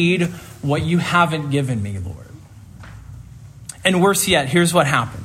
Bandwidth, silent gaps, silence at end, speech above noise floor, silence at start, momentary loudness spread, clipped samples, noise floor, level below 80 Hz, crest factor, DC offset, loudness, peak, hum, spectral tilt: 16 kHz; none; 0 s; 22 dB; 0 s; 23 LU; under 0.1%; -40 dBFS; -48 dBFS; 18 dB; under 0.1%; -18 LUFS; -2 dBFS; none; -4.5 dB/octave